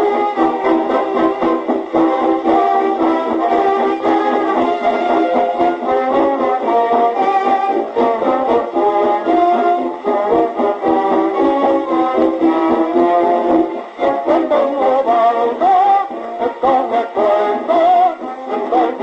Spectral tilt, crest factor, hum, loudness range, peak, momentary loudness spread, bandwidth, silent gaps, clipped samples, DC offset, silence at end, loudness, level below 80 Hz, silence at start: -6 dB/octave; 12 dB; none; 1 LU; -2 dBFS; 4 LU; 7.8 kHz; none; under 0.1%; under 0.1%; 0 s; -15 LUFS; -54 dBFS; 0 s